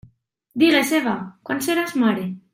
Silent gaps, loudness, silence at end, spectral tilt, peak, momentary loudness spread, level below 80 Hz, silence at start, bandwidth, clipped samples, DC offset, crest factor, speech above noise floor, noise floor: none; -20 LUFS; 0.15 s; -4 dB/octave; -4 dBFS; 12 LU; -64 dBFS; 0.55 s; 16 kHz; under 0.1%; under 0.1%; 16 dB; 38 dB; -58 dBFS